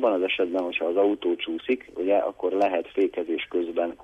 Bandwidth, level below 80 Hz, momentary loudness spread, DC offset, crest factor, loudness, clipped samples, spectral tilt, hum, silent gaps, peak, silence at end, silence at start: 8 kHz; -64 dBFS; 5 LU; under 0.1%; 14 dB; -26 LUFS; under 0.1%; -5.5 dB/octave; none; none; -10 dBFS; 0.1 s; 0 s